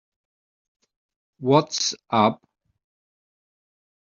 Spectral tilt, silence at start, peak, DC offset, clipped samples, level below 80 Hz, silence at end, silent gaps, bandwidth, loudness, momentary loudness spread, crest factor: -4.5 dB/octave; 1.4 s; -4 dBFS; under 0.1%; under 0.1%; -68 dBFS; 1.75 s; none; 7.6 kHz; -22 LUFS; 10 LU; 24 dB